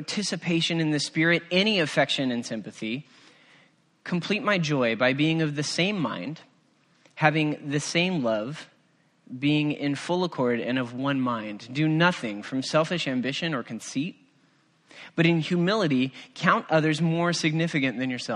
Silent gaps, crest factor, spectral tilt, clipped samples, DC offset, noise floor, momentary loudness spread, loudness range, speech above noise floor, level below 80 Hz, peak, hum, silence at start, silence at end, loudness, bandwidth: none; 22 dB; -5 dB/octave; under 0.1%; under 0.1%; -64 dBFS; 11 LU; 3 LU; 39 dB; -70 dBFS; -4 dBFS; none; 0 s; 0 s; -25 LUFS; 11.5 kHz